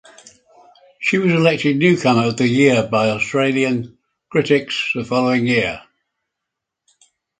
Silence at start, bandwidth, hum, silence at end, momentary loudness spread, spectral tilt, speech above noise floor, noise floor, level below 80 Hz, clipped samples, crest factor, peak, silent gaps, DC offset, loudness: 1 s; 9.4 kHz; none; 1.6 s; 8 LU; -6 dB/octave; 65 dB; -81 dBFS; -56 dBFS; under 0.1%; 18 dB; 0 dBFS; none; under 0.1%; -17 LUFS